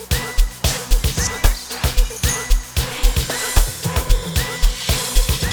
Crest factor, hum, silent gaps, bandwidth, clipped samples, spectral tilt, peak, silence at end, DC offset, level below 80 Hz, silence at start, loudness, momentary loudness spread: 16 dB; none; none; over 20 kHz; under 0.1%; -3 dB/octave; 0 dBFS; 0 s; under 0.1%; -18 dBFS; 0 s; -20 LUFS; 3 LU